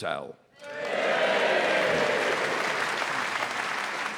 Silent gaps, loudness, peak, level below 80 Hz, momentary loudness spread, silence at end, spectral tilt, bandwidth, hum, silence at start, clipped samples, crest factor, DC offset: none; -26 LUFS; -12 dBFS; -72 dBFS; 12 LU; 0 s; -2.5 dB/octave; over 20 kHz; none; 0 s; under 0.1%; 14 dB; under 0.1%